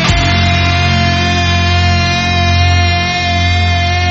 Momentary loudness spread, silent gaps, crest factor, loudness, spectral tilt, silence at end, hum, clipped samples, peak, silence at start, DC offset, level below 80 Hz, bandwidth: 2 LU; none; 10 dB; -11 LUFS; -3.5 dB/octave; 0 s; none; under 0.1%; 0 dBFS; 0 s; under 0.1%; -22 dBFS; 7.8 kHz